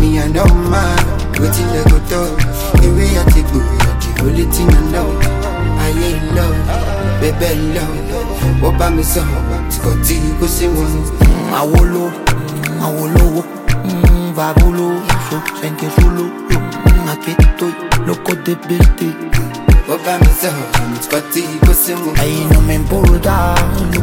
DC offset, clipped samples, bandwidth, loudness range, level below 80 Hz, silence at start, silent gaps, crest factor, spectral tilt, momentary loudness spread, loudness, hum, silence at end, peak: under 0.1%; under 0.1%; 17 kHz; 2 LU; -14 dBFS; 0 s; none; 12 dB; -5.5 dB/octave; 6 LU; -14 LUFS; none; 0 s; 0 dBFS